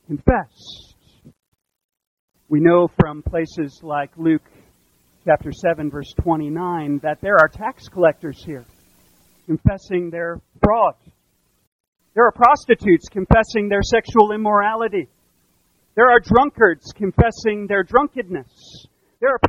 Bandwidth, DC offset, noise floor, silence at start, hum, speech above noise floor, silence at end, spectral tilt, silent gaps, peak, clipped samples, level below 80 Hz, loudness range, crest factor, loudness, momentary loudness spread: 10.5 kHz; under 0.1%; -64 dBFS; 0.1 s; none; 47 dB; 0 s; -7 dB/octave; 1.48-1.52 s, 1.84-1.89 s, 2.07-2.28 s, 11.67-11.92 s; 0 dBFS; under 0.1%; -36 dBFS; 6 LU; 20 dB; -18 LUFS; 14 LU